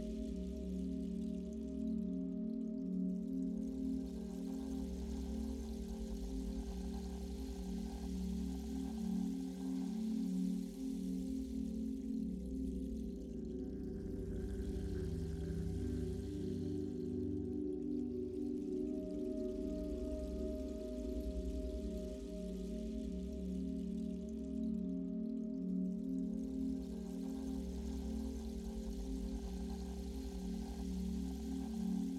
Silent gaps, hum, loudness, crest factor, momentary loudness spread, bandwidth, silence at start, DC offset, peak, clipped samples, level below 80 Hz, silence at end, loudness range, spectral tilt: none; none; -43 LUFS; 12 dB; 5 LU; 14.5 kHz; 0 s; under 0.1%; -30 dBFS; under 0.1%; -48 dBFS; 0 s; 3 LU; -8 dB/octave